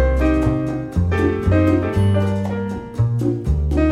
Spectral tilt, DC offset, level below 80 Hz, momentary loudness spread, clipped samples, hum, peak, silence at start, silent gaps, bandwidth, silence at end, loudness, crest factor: -8.5 dB/octave; under 0.1%; -24 dBFS; 6 LU; under 0.1%; none; -4 dBFS; 0 s; none; 10.5 kHz; 0 s; -19 LUFS; 12 dB